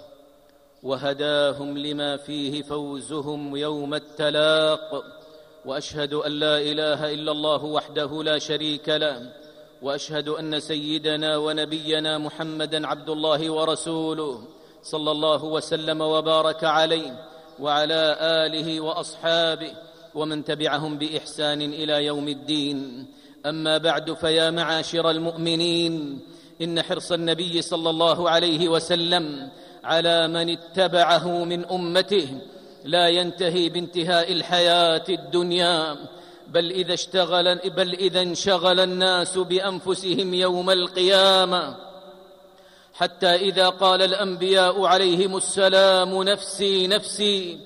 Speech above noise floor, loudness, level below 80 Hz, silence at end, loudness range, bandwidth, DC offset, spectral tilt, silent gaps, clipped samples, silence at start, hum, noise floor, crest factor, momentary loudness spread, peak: 32 dB; -22 LUFS; -66 dBFS; 0 s; 6 LU; 15 kHz; under 0.1%; -3.5 dB/octave; none; under 0.1%; 0 s; none; -55 dBFS; 16 dB; 12 LU; -6 dBFS